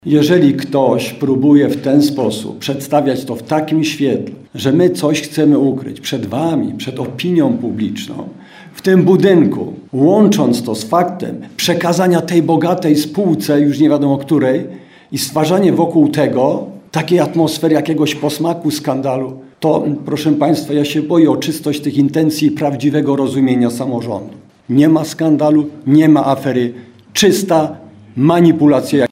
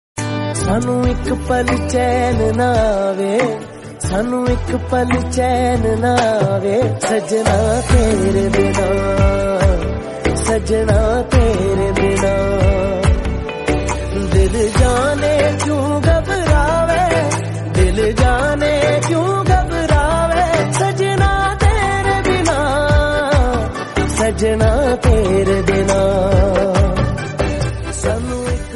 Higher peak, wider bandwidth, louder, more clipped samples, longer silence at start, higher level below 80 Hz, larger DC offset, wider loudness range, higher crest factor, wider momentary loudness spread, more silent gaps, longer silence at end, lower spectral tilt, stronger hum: about the same, 0 dBFS vs 0 dBFS; first, 16 kHz vs 11.5 kHz; about the same, -14 LUFS vs -15 LUFS; neither; about the same, 0.05 s vs 0.15 s; second, -58 dBFS vs -22 dBFS; neither; about the same, 3 LU vs 2 LU; about the same, 14 dB vs 14 dB; first, 11 LU vs 6 LU; neither; about the same, 0.05 s vs 0 s; about the same, -6 dB/octave vs -6 dB/octave; neither